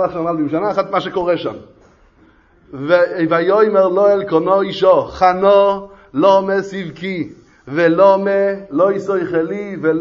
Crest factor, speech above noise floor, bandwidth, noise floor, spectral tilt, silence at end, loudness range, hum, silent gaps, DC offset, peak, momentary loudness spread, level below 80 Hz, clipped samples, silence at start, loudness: 16 dB; 36 dB; 7.2 kHz; -50 dBFS; -7 dB/octave; 0 s; 4 LU; none; none; under 0.1%; 0 dBFS; 13 LU; -52 dBFS; under 0.1%; 0 s; -15 LUFS